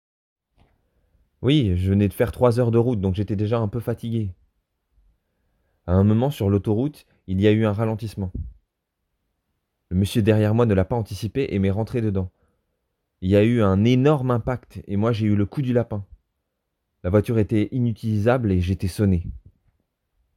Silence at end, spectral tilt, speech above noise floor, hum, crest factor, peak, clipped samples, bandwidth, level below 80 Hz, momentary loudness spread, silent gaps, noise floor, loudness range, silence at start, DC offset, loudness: 1 s; -8 dB/octave; 57 dB; none; 18 dB; -4 dBFS; under 0.1%; 14.5 kHz; -44 dBFS; 11 LU; none; -78 dBFS; 4 LU; 1.4 s; under 0.1%; -22 LUFS